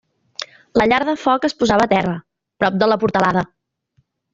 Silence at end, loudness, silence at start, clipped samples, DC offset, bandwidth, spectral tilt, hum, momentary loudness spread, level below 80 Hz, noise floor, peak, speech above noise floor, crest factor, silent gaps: 0.9 s; -17 LUFS; 0.4 s; under 0.1%; under 0.1%; 7.8 kHz; -5.5 dB/octave; none; 16 LU; -48 dBFS; -64 dBFS; 0 dBFS; 48 dB; 18 dB; none